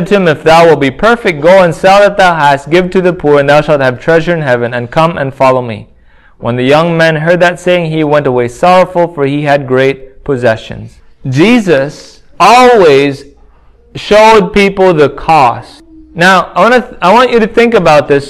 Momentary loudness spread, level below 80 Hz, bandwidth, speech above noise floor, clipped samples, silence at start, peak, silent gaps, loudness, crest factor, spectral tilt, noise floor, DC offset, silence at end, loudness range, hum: 10 LU; -36 dBFS; 16 kHz; 34 dB; 4%; 0 s; 0 dBFS; none; -7 LUFS; 8 dB; -5.5 dB/octave; -41 dBFS; under 0.1%; 0 s; 4 LU; none